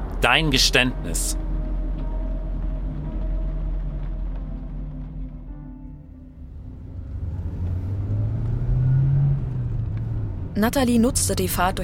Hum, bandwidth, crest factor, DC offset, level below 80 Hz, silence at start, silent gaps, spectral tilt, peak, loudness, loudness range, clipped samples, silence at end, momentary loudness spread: none; 16.5 kHz; 22 dB; under 0.1%; -28 dBFS; 0 s; none; -4.5 dB/octave; -2 dBFS; -23 LUFS; 13 LU; under 0.1%; 0 s; 20 LU